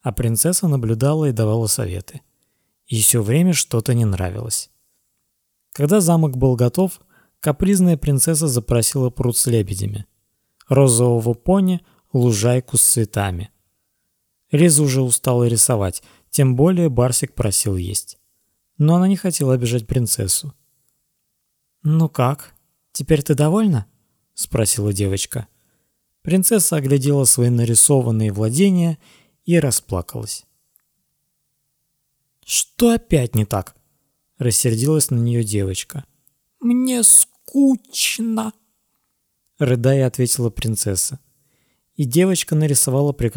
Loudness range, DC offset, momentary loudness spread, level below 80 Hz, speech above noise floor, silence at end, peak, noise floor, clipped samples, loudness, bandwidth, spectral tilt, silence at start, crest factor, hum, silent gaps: 5 LU; under 0.1%; 12 LU; -42 dBFS; 54 dB; 0 s; 0 dBFS; -71 dBFS; under 0.1%; -17 LUFS; over 20 kHz; -5 dB/octave; 0.05 s; 18 dB; none; none